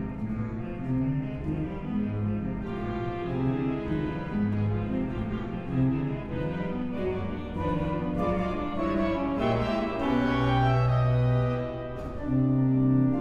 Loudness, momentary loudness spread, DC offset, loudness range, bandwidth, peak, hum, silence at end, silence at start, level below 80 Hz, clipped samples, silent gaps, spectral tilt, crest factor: -28 LUFS; 9 LU; under 0.1%; 5 LU; 6.4 kHz; -12 dBFS; none; 0 s; 0 s; -42 dBFS; under 0.1%; none; -9 dB/octave; 16 dB